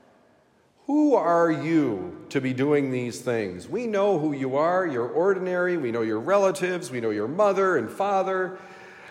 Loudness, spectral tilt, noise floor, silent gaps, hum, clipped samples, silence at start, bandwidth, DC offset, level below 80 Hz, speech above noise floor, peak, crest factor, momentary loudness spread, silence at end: -24 LUFS; -6.5 dB/octave; -61 dBFS; none; none; under 0.1%; 0.9 s; 15.5 kHz; under 0.1%; -76 dBFS; 37 dB; -8 dBFS; 16 dB; 9 LU; 0 s